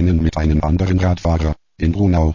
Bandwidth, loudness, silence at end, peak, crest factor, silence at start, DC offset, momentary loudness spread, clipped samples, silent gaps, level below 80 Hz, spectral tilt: 7.4 kHz; -17 LUFS; 0 s; -6 dBFS; 10 dB; 0 s; under 0.1%; 5 LU; under 0.1%; none; -22 dBFS; -8.5 dB/octave